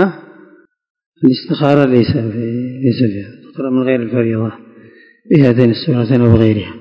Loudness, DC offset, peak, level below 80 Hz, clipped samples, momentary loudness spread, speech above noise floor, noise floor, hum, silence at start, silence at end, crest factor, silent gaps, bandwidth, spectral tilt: -14 LUFS; under 0.1%; 0 dBFS; -40 dBFS; 0.6%; 10 LU; 33 dB; -45 dBFS; none; 0 s; 0 s; 14 dB; 0.90-0.95 s, 1.06-1.12 s; 5.4 kHz; -9.5 dB/octave